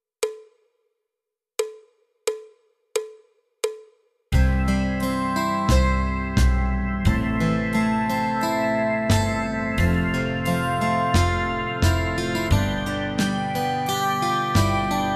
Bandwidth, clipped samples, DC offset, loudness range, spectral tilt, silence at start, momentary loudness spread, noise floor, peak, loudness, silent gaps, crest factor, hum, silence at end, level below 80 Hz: 14 kHz; under 0.1%; under 0.1%; 11 LU; -5.5 dB/octave; 0.2 s; 10 LU; -86 dBFS; -6 dBFS; -23 LUFS; none; 18 dB; none; 0 s; -30 dBFS